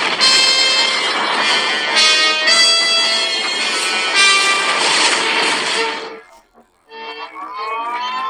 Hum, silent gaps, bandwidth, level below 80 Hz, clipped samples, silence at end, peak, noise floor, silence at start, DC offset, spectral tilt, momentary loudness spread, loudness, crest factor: none; none; 16 kHz; -66 dBFS; under 0.1%; 0 s; 0 dBFS; -52 dBFS; 0 s; under 0.1%; 1 dB/octave; 17 LU; -12 LUFS; 16 dB